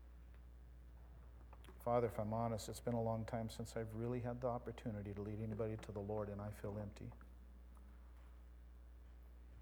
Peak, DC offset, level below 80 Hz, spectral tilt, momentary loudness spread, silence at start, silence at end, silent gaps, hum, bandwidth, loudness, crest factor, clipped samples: -26 dBFS; under 0.1%; -58 dBFS; -7 dB/octave; 20 LU; 0 s; 0 s; none; 60 Hz at -60 dBFS; over 20 kHz; -45 LUFS; 20 dB; under 0.1%